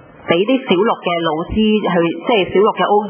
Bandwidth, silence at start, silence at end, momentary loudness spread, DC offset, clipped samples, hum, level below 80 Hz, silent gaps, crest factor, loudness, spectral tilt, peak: 3.4 kHz; 0.25 s; 0 s; 4 LU; under 0.1%; under 0.1%; none; -40 dBFS; none; 14 dB; -15 LUFS; -10 dB/octave; 0 dBFS